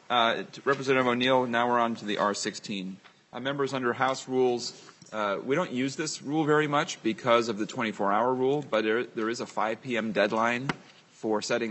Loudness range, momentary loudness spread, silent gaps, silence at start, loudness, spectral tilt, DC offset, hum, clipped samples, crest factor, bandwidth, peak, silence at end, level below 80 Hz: 3 LU; 9 LU; none; 0.1 s; -28 LUFS; -4.5 dB/octave; under 0.1%; none; under 0.1%; 20 dB; 8.4 kHz; -8 dBFS; 0 s; -74 dBFS